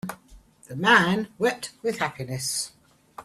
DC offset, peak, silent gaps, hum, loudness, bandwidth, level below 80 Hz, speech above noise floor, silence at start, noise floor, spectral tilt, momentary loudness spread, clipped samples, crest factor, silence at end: under 0.1%; -6 dBFS; none; none; -24 LUFS; 15 kHz; -60 dBFS; 28 dB; 0.05 s; -52 dBFS; -3.5 dB/octave; 16 LU; under 0.1%; 22 dB; 0 s